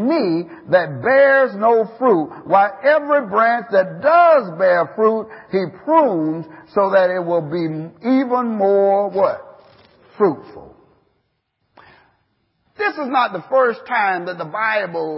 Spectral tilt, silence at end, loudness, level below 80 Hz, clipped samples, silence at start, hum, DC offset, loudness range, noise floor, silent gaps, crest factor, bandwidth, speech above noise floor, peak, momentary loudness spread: -11 dB/octave; 0 s; -17 LUFS; -66 dBFS; under 0.1%; 0 s; none; under 0.1%; 10 LU; -69 dBFS; none; 16 dB; 5.8 kHz; 53 dB; 0 dBFS; 10 LU